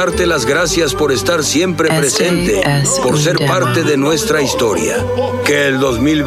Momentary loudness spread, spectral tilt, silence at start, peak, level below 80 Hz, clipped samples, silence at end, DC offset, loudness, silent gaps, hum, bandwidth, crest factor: 2 LU; -4 dB/octave; 0 s; 0 dBFS; -34 dBFS; under 0.1%; 0 s; under 0.1%; -13 LUFS; none; none; 16 kHz; 14 dB